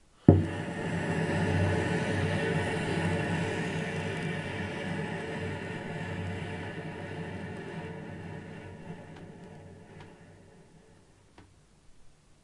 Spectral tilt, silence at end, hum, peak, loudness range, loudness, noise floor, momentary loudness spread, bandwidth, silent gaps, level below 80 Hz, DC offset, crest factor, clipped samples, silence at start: -6.5 dB/octave; 0.35 s; none; -2 dBFS; 19 LU; -32 LUFS; -59 dBFS; 19 LU; 11.5 kHz; none; -60 dBFS; under 0.1%; 30 dB; under 0.1%; 0.25 s